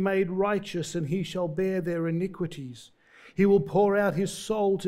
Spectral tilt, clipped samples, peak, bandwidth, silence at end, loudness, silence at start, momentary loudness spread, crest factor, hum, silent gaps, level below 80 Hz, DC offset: -6.5 dB/octave; under 0.1%; -12 dBFS; 15 kHz; 0 s; -27 LUFS; 0 s; 12 LU; 16 dB; none; none; -58 dBFS; under 0.1%